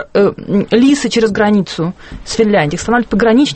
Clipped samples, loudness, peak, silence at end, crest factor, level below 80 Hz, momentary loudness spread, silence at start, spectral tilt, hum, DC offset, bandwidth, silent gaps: under 0.1%; -13 LUFS; 0 dBFS; 0 s; 12 dB; -38 dBFS; 10 LU; 0 s; -5.5 dB/octave; none; under 0.1%; 8.8 kHz; none